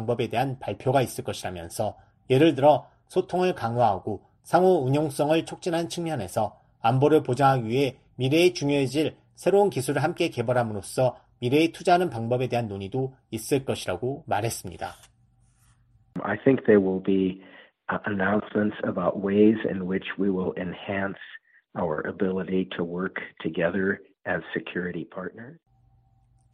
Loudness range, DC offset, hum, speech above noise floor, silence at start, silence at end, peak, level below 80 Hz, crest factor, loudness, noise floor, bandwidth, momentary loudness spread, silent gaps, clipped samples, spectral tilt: 6 LU; under 0.1%; none; 37 dB; 0 s; 1 s; -6 dBFS; -60 dBFS; 20 dB; -25 LUFS; -62 dBFS; 13.5 kHz; 12 LU; none; under 0.1%; -6 dB/octave